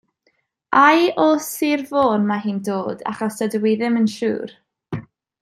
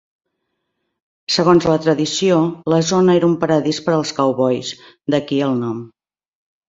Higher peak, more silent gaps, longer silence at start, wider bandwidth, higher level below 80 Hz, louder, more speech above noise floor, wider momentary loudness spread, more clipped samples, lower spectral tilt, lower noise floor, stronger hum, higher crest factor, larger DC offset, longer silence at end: about the same, -2 dBFS vs -2 dBFS; neither; second, 0.7 s vs 1.3 s; first, 15.5 kHz vs 7.8 kHz; second, -62 dBFS vs -54 dBFS; second, -19 LUFS vs -16 LUFS; second, 48 dB vs 58 dB; first, 17 LU vs 10 LU; neither; about the same, -5 dB/octave vs -5.5 dB/octave; second, -67 dBFS vs -74 dBFS; neither; about the same, 18 dB vs 16 dB; neither; second, 0.4 s vs 0.8 s